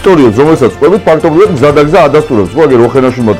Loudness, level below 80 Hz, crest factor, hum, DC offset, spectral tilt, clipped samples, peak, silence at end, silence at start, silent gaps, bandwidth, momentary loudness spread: -6 LUFS; -32 dBFS; 6 dB; none; under 0.1%; -7 dB/octave; 0.8%; 0 dBFS; 0 s; 0 s; none; 13.5 kHz; 3 LU